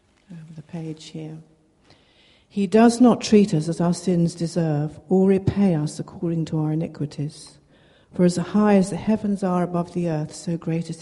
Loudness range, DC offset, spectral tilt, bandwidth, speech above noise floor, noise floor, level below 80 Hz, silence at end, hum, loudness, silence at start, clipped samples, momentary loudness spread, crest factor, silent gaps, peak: 4 LU; under 0.1%; -7 dB/octave; 11.5 kHz; 36 dB; -57 dBFS; -54 dBFS; 0 s; none; -21 LUFS; 0.3 s; under 0.1%; 17 LU; 18 dB; none; -4 dBFS